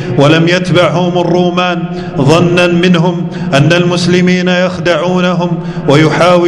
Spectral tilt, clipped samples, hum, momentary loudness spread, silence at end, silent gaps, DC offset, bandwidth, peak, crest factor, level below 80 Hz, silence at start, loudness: -6 dB/octave; 2%; none; 6 LU; 0 s; none; under 0.1%; 11 kHz; 0 dBFS; 8 dB; -42 dBFS; 0 s; -9 LUFS